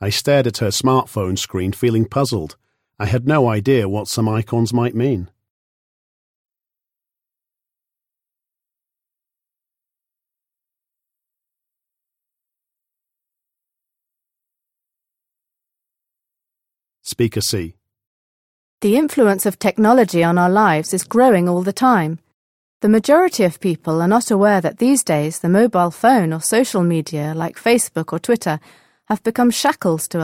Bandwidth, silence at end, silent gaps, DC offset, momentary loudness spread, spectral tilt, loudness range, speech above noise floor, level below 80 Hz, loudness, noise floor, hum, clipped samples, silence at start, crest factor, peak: 17 kHz; 0 s; 5.50-6.45 s, 18.06-18.78 s, 22.34-22.80 s; under 0.1%; 9 LU; -5.5 dB/octave; 11 LU; 72 dB; -54 dBFS; -17 LUFS; -88 dBFS; none; under 0.1%; 0 s; 18 dB; -2 dBFS